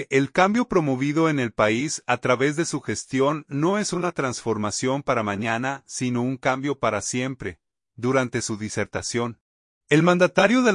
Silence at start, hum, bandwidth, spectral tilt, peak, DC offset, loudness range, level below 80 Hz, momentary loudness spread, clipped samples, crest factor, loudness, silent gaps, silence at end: 0 s; none; 11 kHz; -5 dB/octave; -4 dBFS; under 0.1%; 4 LU; -58 dBFS; 9 LU; under 0.1%; 20 dB; -23 LUFS; 9.41-9.81 s; 0 s